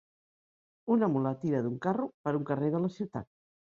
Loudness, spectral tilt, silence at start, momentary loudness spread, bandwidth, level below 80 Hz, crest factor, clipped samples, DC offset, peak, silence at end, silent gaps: -31 LUFS; -9.5 dB/octave; 0.85 s; 11 LU; 7.2 kHz; -70 dBFS; 16 dB; under 0.1%; under 0.1%; -16 dBFS; 0.55 s; 2.14-2.24 s